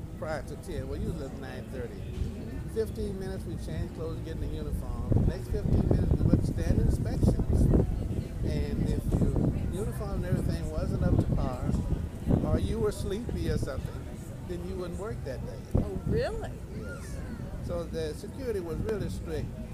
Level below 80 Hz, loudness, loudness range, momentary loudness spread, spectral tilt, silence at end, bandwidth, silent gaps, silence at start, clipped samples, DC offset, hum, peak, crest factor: -36 dBFS; -32 LUFS; 8 LU; 12 LU; -8 dB/octave; 0 s; 15.5 kHz; none; 0 s; under 0.1%; under 0.1%; none; -8 dBFS; 22 dB